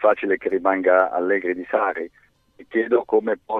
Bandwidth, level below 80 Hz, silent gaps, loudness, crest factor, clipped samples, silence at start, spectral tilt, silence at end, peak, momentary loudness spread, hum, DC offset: 4 kHz; -64 dBFS; none; -21 LUFS; 18 dB; under 0.1%; 0 s; -7.5 dB/octave; 0 s; -4 dBFS; 8 LU; none; under 0.1%